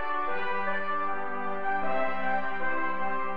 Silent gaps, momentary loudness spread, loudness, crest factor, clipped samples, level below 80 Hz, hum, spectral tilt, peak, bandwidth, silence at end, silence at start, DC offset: none; 3 LU; -31 LUFS; 12 dB; under 0.1%; -58 dBFS; none; -7 dB/octave; -16 dBFS; 6.2 kHz; 0 s; 0 s; 3%